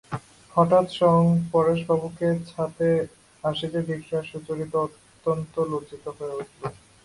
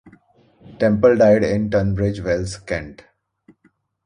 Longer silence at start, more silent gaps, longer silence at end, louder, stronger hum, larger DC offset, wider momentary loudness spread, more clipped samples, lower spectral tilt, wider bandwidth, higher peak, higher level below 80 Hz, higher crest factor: about the same, 0.1 s vs 0.05 s; neither; second, 0.35 s vs 1.1 s; second, -25 LUFS vs -18 LUFS; neither; neither; about the same, 15 LU vs 13 LU; neither; about the same, -7.5 dB/octave vs -7 dB/octave; about the same, 11.5 kHz vs 10.5 kHz; second, -6 dBFS vs -2 dBFS; second, -58 dBFS vs -40 dBFS; about the same, 18 dB vs 18 dB